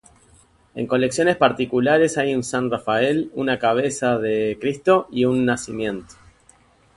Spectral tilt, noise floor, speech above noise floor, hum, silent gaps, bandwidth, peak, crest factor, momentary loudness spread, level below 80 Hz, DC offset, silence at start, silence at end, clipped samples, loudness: -5 dB/octave; -55 dBFS; 35 dB; none; none; 11.5 kHz; -2 dBFS; 20 dB; 8 LU; -56 dBFS; under 0.1%; 0.75 s; 0.95 s; under 0.1%; -20 LUFS